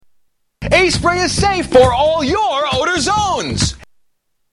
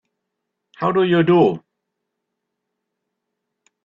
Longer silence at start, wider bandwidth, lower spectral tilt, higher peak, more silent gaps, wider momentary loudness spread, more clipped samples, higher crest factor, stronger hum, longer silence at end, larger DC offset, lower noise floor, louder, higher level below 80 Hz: second, 0.6 s vs 0.8 s; first, 12 kHz vs 5.6 kHz; second, -4 dB/octave vs -9 dB/octave; first, 0 dBFS vs -4 dBFS; neither; second, 7 LU vs 10 LU; neither; about the same, 16 dB vs 18 dB; neither; second, 0.7 s vs 2.25 s; neither; second, -65 dBFS vs -79 dBFS; first, -14 LUFS vs -17 LUFS; first, -32 dBFS vs -64 dBFS